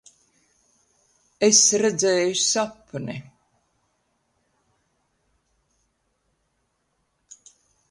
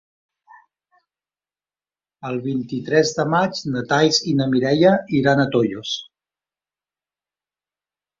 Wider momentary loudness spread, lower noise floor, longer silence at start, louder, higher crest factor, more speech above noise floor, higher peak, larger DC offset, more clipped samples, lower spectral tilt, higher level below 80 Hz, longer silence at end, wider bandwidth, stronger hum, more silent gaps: first, 19 LU vs 11 LU; second, -72 dBFS vs under -90 dBFS; second, 1.4 s vs 2.25 s; about the same, -19 LUFS vs -19 LUFS; about the same, 24 dB vs 20 dB; second, 51 dB vs over 71 dB; about the same, -4 dBFS vs -2 dBFS; neither; neither; second, -2 dB/octave vs -5 dB/octave; second, -70 dBFS vs -60 dBFS; first, 4.7 s vs 2.15 s; first, 11.5 kHz vs 7.6 kHz; second, none vs 50 Hz at -50 dBFS; neither